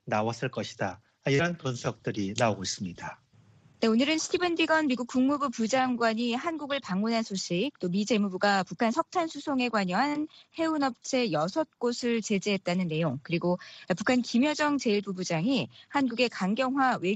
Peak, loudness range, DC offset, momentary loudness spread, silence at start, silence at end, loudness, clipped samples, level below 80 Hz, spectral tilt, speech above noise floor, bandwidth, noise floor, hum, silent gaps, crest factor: -8 dBFS; 2 LU; under 0.1%; 8 LU; 0.05 s; 0 s; -28 LUFS; under 0.1%; -68 dBFS; -5 dB/octave; 31 dB; 8.4 kHz; -59 dBFS; none; none; 20 dB